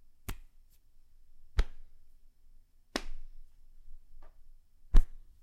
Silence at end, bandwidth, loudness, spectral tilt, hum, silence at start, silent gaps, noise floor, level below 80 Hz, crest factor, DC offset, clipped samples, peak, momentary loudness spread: 0.25 s; 12.5 kHz; -38 LUFS; -5 dB/octave; none; 0.3 s; none; -58 dBFS; -34 dBFS; 26 dB; under 0.1%; under 0.1%; -8 dBFS; 28 LU